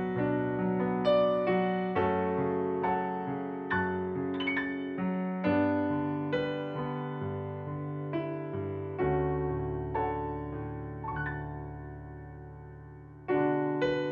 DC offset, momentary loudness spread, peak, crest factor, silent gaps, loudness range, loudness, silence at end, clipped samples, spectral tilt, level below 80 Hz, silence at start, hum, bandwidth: under 0.1%; 14 LU; -16 dBFS; 16 dB; none; 7 LU; -32 LUFS; 0 s; under 0.1%; -9 dB/octave; -52 dBFS; 0 s; none; 7 kHz